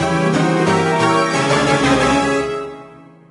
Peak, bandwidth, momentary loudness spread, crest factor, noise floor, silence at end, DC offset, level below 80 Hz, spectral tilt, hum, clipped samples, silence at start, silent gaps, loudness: -2 dBFS; 11.5 kHz; 7 LU; 14 dB; -40 dBFS; 0.3 s; under 0.1%; -40 dBFS; -5 dB/octave; none; under 0.1%; 0 s; none; -15 LUFS